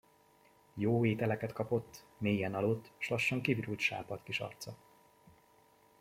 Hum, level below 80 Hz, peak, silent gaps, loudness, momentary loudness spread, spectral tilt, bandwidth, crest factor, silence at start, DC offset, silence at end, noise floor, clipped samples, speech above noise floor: none; -70 dBFS; -16 dBFS; none; -35 LUFS; 12 LU; -6 dB/octave; 16 kHz; 20 dB; 0.75 s; under 0.1%; 1.25 s; -66 dBFS; under 0.1%; 31 dB